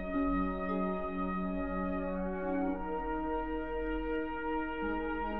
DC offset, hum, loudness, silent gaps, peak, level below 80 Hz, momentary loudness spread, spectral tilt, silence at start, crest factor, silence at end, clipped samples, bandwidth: 0.4%; none; -35 LUFS; none; -22 dBFS; -46 dBFS; 3 LU; -6 dB/octave; 0 s; 12 dB; 0 s; under 0.1%; 4.1 kHz